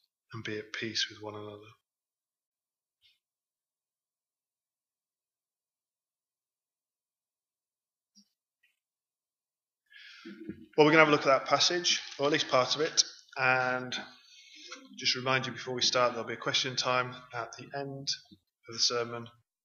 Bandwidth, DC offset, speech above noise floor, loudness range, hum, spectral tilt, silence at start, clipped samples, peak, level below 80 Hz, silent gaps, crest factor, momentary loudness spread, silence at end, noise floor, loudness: 7.6 kHz; under 0.1%; over 60 dB; 13 LU; none; -2.5 dB/octave; 0.3 s; under 0.1%; -6 dBFS; -82 dBFS; 2.46-2.52 s; 28 dB; 21 LU; 0.35 s; under -90 dBFS; -29 LUFS